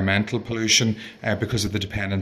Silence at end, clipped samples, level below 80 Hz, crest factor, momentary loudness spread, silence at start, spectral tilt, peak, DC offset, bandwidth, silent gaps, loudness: 0 s; under 0.1%; -46 dBFS; 18 dB; 9 LU; 0 s; -3.5 dB/octave; -4 dBFS; under 0.1%; 14 kHz; none; -22 LUFS